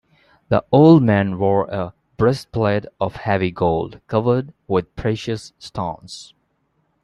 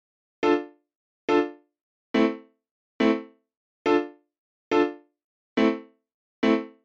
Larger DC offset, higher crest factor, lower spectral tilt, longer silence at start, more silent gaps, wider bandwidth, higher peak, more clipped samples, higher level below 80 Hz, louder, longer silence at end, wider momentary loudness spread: neither; about the same, 18 dB vs 20 dB; first, -8 dB/octave vs -5.5 dB/octave; about the same, 0.5 s vs 0.4 s; second, none vs 0.96-1.28 s, 1.81-2.14 s, 2.71-2.99 s, 3.57-3.85 s, 4.38-4.71 s, 5.24-5.56 s, 6.14-6.42 s; first, 11.5 kHz vs 7.6 kHz; first, -2 dBFS vs -8 dBFS; neither; first, -48 dBFS vs -64 dBFS; first, -19 LUFS vs -26 LUFS; first, 0.8 s vs 0.15 s; first, 15 LU vs 11 LU